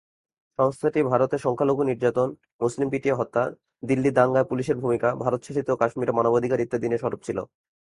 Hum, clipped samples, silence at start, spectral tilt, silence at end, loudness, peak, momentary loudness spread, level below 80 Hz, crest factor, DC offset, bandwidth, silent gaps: none; under 0.1%; 0.6 s; -7.5 dB/octave; 0.5 s; -24 LUFS; -4 dBFS; 7 LU; -60 dBFS; 20 dB; under 0.1%; 11.5 kHz; 2.53-2.59 s